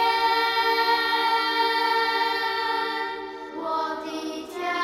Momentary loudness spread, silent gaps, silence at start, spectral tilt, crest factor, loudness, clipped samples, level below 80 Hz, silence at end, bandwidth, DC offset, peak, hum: 11 LU; none; 0 s; -1.5 dB/octave; 14 dB; -24 LUFS; under 0.1%; -62 dBFS; 0 s; 16 kHz; under 0.1%; -10 dBFS; none